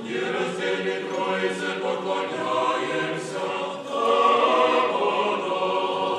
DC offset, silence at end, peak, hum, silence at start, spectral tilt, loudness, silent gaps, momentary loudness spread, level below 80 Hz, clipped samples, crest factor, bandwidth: under 0.1%; 0 s; -8 dBFS; none; 0 s; -4 dB/octave; -24 LUFS; none; 9 LU; -84 dBFS; under 0.1%; 16 dB; 11.5 kHz